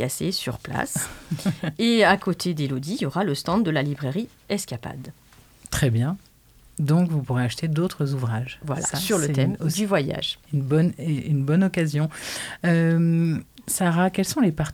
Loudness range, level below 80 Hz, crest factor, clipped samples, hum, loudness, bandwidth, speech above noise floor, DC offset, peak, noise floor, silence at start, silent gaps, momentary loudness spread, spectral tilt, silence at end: 4 LU; -50 dBFS; 20 dB; under 0.1%; none; -24 LUFS; 18 kHz; 26 dB; under 0.1%; -4 dBFS; -49 dBFS; 0 s; none; 9 LU; -5.5 dB/octave; 0 s